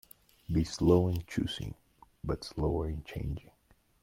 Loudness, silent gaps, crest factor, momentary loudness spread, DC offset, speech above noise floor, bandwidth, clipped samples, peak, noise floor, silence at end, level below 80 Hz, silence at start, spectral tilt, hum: -32 LUFS; none; 20 dB; 18 LU; under 0.1%; 36 dB; 16.5 kHz; under 0.1%; -14 dBFS; -67 dBFS; 0.6 s; -46 dBFS; 0.5 s; -7 dB/octave; none